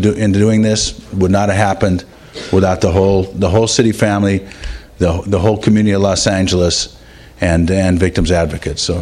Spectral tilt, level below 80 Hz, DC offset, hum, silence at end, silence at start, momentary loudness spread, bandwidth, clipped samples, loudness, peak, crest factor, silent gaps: -5.5 dB/octave; -30 dBFS; under 0.1%; none; 0 s; 0 s; 7 LU; 12.5 kHz; under 0.1%; -14 LUFS; 0 dBFS; 14 dB; none